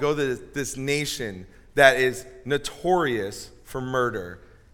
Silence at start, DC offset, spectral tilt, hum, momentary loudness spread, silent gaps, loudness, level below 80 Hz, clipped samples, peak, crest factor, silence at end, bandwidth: 0 s; under 0.1%; -4 dB/octave; none; 18 LU; none; -24 LUFS; -50 dBFS; under 0.1%; 0 dBFS; 24 dB; 0.4 s; 18.5 kHz